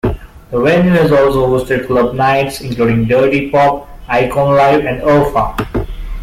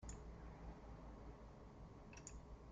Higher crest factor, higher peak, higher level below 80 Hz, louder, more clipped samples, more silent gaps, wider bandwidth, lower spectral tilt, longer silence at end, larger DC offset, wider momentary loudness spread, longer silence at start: second, 10 dB vs 18 dB; first, -2 dBFS vs -38 dBFS; first, -30 dBFS vs -58 dBFS; first, -12 LUFS vs -58 LUFS; neither; neither; first, 16 kHz vs 9 kHz; first, -7 dB/octave vs -5.5 dB/octave; about the same, 0 s vs 0 s; neither; first, 10 LU vs 4 LU; about the same, 0.05 s vs 0 s